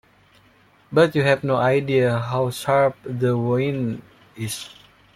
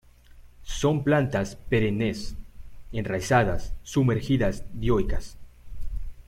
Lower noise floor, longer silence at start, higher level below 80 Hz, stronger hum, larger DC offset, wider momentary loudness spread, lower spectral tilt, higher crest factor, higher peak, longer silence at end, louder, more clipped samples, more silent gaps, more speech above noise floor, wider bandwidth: first, -55 dBFS vs -49 dBFS; first, 0.9 s vs 0.35 s; second, -58 dBFS vs -36 dBFS; neither; neither; second, 12 LU vs 17 LU; about the same, -6 dB/octave vs -6.5 dB/octave; about the same, 18 dB vs 18 dB; about the same, -4 dBFS vs -6 dBFS; first, 0.45 s vs 0.05 s; first, -21 LUFS vs -26 LUFS; neither; neither; first, 35 dB vs 25 dB; about the same, 15 kHz vs 15 kHz